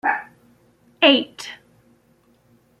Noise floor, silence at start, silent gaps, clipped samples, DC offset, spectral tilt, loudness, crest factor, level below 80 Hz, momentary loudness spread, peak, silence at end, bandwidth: -59 dBFS; 0.05 s; none; under 0.1%; under 0.1%; -2.5 dB/octave; -18 LUFS; 22 dB; -70 dBFS; 20 LU; -2 dBFS; 1.25 s; 12.5 kHz